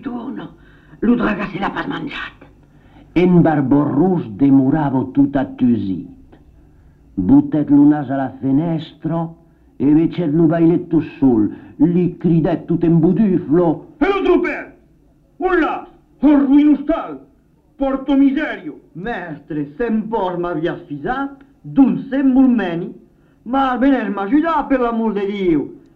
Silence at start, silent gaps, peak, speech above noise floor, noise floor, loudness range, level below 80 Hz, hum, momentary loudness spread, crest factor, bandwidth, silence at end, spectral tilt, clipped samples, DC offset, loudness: 0 s; none; -2 dBFS; 38 dB; -53 dBFS; 5 LU; -42 dBFS; none; 13 LU; 14 dB; 4.7 kHz; 0.2 s; -10 dB/octave; under 0.1%; under 0.1%; -16 LUFS